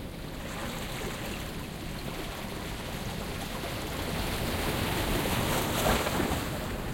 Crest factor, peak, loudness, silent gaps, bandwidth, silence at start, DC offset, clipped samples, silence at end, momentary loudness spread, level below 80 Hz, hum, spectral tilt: 20 dB; -12 dBFS; -32 LUFS; none; 16.5 kHz; 0 s; under 0.1%; under 0.1%; 0 s; 10 LU; -42 dBFS; none; -4 dB/octave